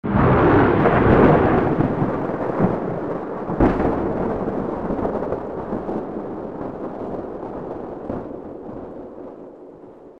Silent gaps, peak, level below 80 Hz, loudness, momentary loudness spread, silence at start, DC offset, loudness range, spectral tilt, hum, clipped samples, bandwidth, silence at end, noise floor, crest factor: none; -2 dBFS; -36 dBFS; -21 LUFS; 19 LU; 0.05 s; 0.5%; 14 LU; -10 dB/octave; none; under 0.1%; 6.6 kHz; 0 s; -42 dBFS; 20 dB